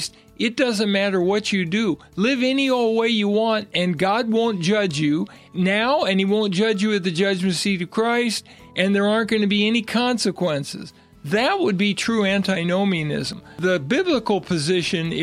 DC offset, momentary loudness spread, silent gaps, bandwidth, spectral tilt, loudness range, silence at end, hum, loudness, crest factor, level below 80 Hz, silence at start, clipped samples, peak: under 0.1%; 6 LU; none; 14 kHz; -5 dB/octave; 1 LU; 0 s; none; -21 LUFS; 16 dB; -58 dBFS; 0 s; under 0.1%; -4 dBFS